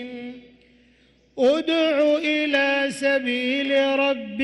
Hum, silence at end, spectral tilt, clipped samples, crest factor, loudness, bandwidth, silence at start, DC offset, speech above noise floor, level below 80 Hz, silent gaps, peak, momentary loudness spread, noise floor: none; 0 s; -3.5 dB/octave; under 0.1%; 12 dB; -21 LUFS; 12 kHz; 0 s; under 0.1%; 37 dB; -66 dBFS; none; -10 dBFS; 12 LU; -58 dBFS